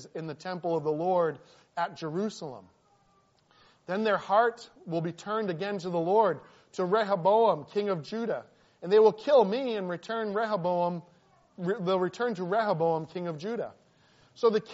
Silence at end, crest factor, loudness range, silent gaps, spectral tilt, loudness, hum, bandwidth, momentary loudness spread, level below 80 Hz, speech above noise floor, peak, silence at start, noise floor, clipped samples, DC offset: 0 s; 18 dB; 6 LU; none; -4.5 dB/octave; -29 LUFS; none; 8 kHz; 14 LU; -78 dBFS; 38 dB; -10 dBFS; 0 s; -66 dBFS; under 0.1%; under 0.1%